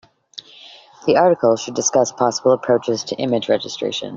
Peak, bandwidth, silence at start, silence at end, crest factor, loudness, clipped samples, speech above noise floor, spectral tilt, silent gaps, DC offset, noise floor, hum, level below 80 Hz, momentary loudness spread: -2 dBFS; 7.8 kHz; 0.35 s; 0 s; 18 dB; -18 LUFS; under 0.1%; 26 dB; -3.5 dB/octave; none; under 0.1%; -43 dBFS; none; -60 dBFS; 17 LU